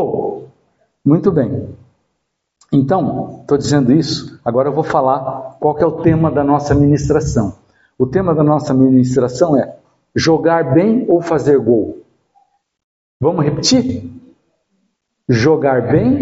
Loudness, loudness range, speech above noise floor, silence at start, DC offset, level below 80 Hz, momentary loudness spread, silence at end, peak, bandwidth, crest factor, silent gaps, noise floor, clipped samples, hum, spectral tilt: -14 LUFS; 5 LU; 58 dB; 0 s; under 0.1%; -40 dBFS; 10 LU; 0 s; 0 dBFS; 8 kHz; 14 dB; 12.84-13.20 s; -72 dBFS; under 0.1%; none; -6.5 dB/octave